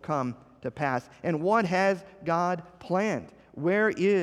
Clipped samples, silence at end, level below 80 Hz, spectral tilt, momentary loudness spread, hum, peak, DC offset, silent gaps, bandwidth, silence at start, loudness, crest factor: under 0.1%; 0 s; -66 dBFS; -6.5 dB/octave; 11 LU; none; -12 dBFS; under 0.1%; none; 11.5 kHz; 0.05 s; -28 LUFS; 16 dB